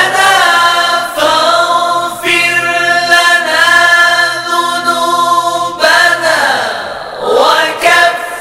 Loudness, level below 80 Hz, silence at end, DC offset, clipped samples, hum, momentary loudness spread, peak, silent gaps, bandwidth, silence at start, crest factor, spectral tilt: -8 LUFS; -50 dBFS; 0 s; under 0.1%; 1%; none; 7 LU; 0 dBFS; none; over 20 kHz; 0 s; 10 dB; -1 dB/octave